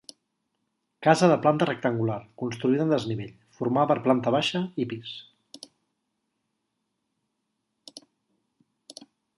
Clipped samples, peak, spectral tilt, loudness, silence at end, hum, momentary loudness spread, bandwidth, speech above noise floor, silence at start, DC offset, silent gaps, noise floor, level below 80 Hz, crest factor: under 0.1%; -4 dBFS; -6 dB/octave; -25 LUFS; 1.4 s; none; 25 LU; 11.5 kHz; 55 dB; 1 s; under 0.1%; none; -79 dBFS; -68 dBFS; 24 dB